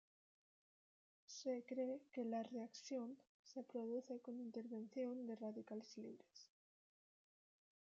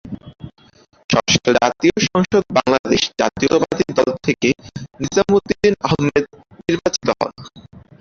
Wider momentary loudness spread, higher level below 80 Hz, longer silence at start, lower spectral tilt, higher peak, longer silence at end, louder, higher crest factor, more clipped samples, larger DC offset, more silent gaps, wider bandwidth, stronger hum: about the same, 11 LU vs 11 LU; second, under -90 dBFS vs -46 dBFS; first, 1.3 s vs 0.05 s; about the same, -5 dB/octave vs -4.5 dB/octave; second, -34 dBFS vs 0 dBFS; first, 1.5 s vs 0.2 s; second, -50 LUFS vs -17 LUFS; about the same, 16 dB vs 18 dB; neither; neither; about the same, 3.29-3.44 s vs 1.04-1.09 s, 2.79-2.84 s; about the same, 7.6 kHz vs 7.6 kHz; neither